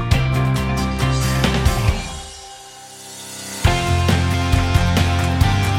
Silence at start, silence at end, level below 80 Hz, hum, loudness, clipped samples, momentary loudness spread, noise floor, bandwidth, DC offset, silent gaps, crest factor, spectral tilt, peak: 0 s; 0 s; -26 dBFS; none; -18 LUFS; under 0.1%; 17 LU; -38 dBFS; 16.5 kHz; under 0.1%; none; 16 dB; -5 dB/octave; -2 dBFS